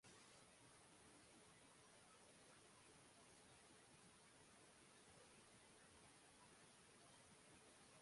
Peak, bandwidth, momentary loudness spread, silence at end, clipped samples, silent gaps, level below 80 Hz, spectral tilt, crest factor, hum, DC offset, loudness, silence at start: -54 dBFS; 11.5 kHz; 1 LU; 0 s; under 0.1%; none; -88 dBFS; -2.5 dB/octave; 14 dB; none; under 0.1%; -68 LUFS; 0 s